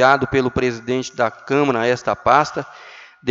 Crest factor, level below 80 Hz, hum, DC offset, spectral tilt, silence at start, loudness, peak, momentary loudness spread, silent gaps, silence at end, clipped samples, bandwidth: 18 dB; -48 dBFS; none; under 0.1%; -5.5 dB/octave; 0 s; -19 LUFS; 0 dBFS; 13 LU; none; 0 s; under 0.1%; 7.8 kHz